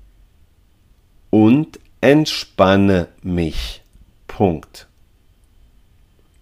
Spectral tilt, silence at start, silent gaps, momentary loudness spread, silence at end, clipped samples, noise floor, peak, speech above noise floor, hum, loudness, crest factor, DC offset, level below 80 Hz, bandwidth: -6.5 dB/octave; 1.35 s; none; 16 LU; 1.65 s; under 0.1%; -53 dBFS; 0 dBFS; 37 dB; none; -17 LUFS; 20 dB; under 0.1%; -38 dBFS; 15 kHz